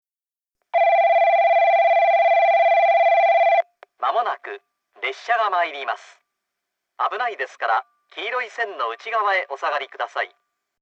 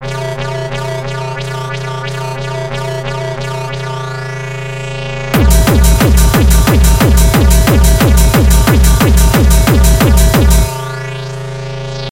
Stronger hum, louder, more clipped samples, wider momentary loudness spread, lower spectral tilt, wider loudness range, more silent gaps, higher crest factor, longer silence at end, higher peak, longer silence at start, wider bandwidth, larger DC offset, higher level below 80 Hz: neither; second, -20 LUFS vs -12 LUFS; neither; about the same, 13 LU vs 12 LU; second, 0 dB/octave vs -5 dB/octave; about the same, 9 LU vs 10 LU; neither; about the same, 12 dB vs 10 dB; first, 0.55 s vs 0 s; second, -8 dBFS vs 0 dBFS; first, 0.75 s vs 0 s; second, 7.2 kHz vs 17 kHz; neither; second, under -90 dBFS vs -12 dBFS